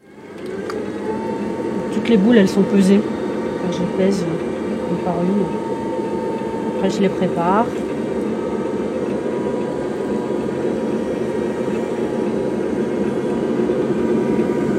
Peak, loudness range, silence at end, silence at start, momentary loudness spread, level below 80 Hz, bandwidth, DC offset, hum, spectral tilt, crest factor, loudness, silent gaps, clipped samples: -2 dBFS; 5 LU; 0 s; 0.1 s; 8 LU; -50 dBFS; 12 kHz; under 0.1%; none; -7 dB/octave; 18 dB; -20 LUFS; none; under 0.1%